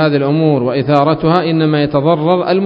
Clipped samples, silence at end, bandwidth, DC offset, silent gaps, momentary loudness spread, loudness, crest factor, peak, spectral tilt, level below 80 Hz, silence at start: under 0.1%; 0 s; 5.4 kHz; under 0.1%; none; 1 LU; -13 LUFS; 12 dB; 0 dBFS; -9.5 dB/octave; -46 dBFS; 0 s